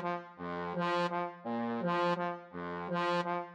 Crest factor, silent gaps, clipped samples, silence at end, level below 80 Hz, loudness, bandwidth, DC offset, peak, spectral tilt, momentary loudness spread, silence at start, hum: 14 dB; none; under 0.1%; 0 s; -76 dBFS; -35 LUFS; 9.2 kHz; under 0.1%; -22 dBFS; -6.5 dB/octave; 9 LU; 0 s; none